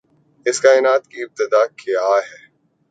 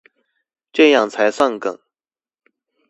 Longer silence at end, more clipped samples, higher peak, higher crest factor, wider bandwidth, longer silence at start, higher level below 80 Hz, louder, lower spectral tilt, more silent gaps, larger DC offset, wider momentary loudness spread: second, 0.6 s vs 1.15 s; neither; about the same, 0 dBFS vs 0 dBFS; about the same, 18 dB vs 20 dB; second, 9.2 kHz vs 10.5 kHz; second, 0.45 s vs 0.75 s; second, -74 dBFS vs -68 dBFS; about the same, -17 LUFS vs -16 LUFS; second, -1.5 dB/octave vs -3.5 dB/octave; neither; neither; about the same, 11 LU vs 13 LU